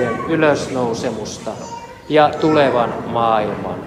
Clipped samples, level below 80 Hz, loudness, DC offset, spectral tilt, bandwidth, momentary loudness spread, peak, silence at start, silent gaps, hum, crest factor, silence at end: under 0.1%; -50 dBFS; -17 LUFS; under 0.1%; -5.5 dB/octave; 13 kHz; 14 LU; 0 dBFS; 0 s; none; none; 18 dB; 0 s